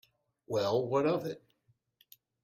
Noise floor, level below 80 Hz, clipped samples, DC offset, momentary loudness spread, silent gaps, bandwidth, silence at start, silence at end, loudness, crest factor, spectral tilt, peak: -73 dBFS; -74 dBFS; under 0.1%; under 0.1%; 12 LU; none; 16.5 kHz; 0.5 s; 1.05 s; -32 LUFS; 16 dB; -6.5 dB/octave; -18 dBFS